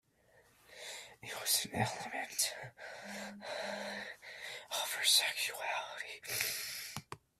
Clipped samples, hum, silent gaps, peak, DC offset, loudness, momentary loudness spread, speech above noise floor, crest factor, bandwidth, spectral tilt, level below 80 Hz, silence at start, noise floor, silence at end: under 0.1%; none; none; -16 dBFS; under 0.1%; -36 LUFS; 18 LU; 32 dB; 24 dB; 16 kHz; -1 dB/octave; -74 dBFS; 0.35 s; -68 dBFS; 0.2 s